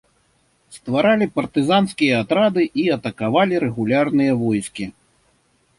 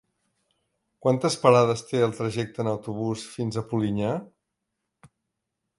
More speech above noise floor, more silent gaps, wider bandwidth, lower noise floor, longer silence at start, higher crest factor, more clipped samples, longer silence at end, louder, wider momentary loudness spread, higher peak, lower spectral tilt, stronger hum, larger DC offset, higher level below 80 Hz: second, 44 dB vs 58 dB; neither; about the same, 11.5 kHz vs 11.5 kHz; second, -62 dBFS vs -82 dBFS; second, 0.7 s vs 1.05 s; second, 16 dB vs 24 dB; neither; second, 0.9 s vs 1.55 s; first, -19 LUFS vs -25 LUFS; second, 7 LU vs 11 LU; about the same, -4 dBFS vs -4 dBFS; about the same, -6 dB/octave vs -6 dB/octave; neither; neither; first, -56 dBFS vs -62 dBFS